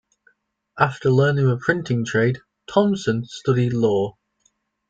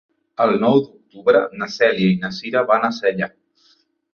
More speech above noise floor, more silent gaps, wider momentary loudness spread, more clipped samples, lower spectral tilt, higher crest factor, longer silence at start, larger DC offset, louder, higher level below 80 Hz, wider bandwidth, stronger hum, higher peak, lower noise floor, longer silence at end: first, 47 dB vs 41 dB; neither; second, 6 LU vs 10 LU; neither; about the same, -7 dB/octave vs -6.5 dB/octave; about the same, 18 dB vs 18 dB; first, 0.75 s vs 0.4 s; neither; second, -21 LUFS vs -18 LUFS; first, -56 dBFS vs -62 dBFS; first, 7.8 kHz vs 6.8 kHz; neither; about the same, -4 dBFS vs -2 dBFS; first, -66 dBFS vs -59 dBFS; about the same, 0.8 s vs 0.85 s